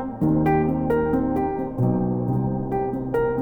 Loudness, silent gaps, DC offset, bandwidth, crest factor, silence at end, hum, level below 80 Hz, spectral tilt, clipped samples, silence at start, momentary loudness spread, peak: -23 LUFS; none; under 0.1%; 20 kHz; 14 dB; 0 s; none; -40 dBFS; -11 dB/octave; under 0.1%; 0 s; 5 LU; -8 dBFS